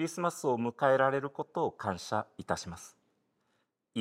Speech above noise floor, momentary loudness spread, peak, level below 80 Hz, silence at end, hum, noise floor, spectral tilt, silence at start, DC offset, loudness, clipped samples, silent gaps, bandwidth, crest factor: 46 dB; 14 LU; -12 dBFS; -68 dBFS; 0 s; none; -78 dBFS; -5 dB/octave; 0 s; under 0.1%; -32 LUFS; under 0.1%; none; 16 kHz; 22 dB